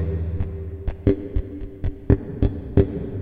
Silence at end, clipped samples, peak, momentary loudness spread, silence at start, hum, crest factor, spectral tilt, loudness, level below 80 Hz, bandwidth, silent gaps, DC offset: 0 s; under 0.1%; 0 dBFS; 11 LU; 0 s; none; 22 dB; -12 dB/octave; -24 LUFS; -30 dBFS; 4.3 kHz; none; under 0.1%